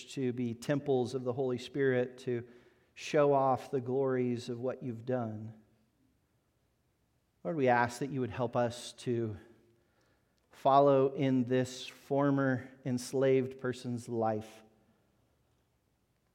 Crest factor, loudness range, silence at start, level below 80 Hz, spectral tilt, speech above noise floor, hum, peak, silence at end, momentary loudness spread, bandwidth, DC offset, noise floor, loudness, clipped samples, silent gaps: 22 dB; 6 LU; 0 s; -76 dBFS; -6.5 dB/octave; 44 dB; none; -12 dBFS; 1.75 s; 12 LU; 15.5 kHz; under 0.1%; -75 dBFS; -32 LUFS; under 0.1%; none